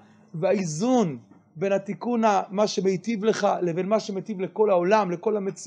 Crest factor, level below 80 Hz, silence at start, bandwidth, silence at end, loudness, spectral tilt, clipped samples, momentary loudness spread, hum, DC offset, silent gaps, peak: 18 dB; -76 dBFS; 0.35 s; 10 kHz; 0 s; -24 LUFS; -5.5 dB/octave; under 0.1%; 8 LU; none; under 0.1%; none; -6 dBFS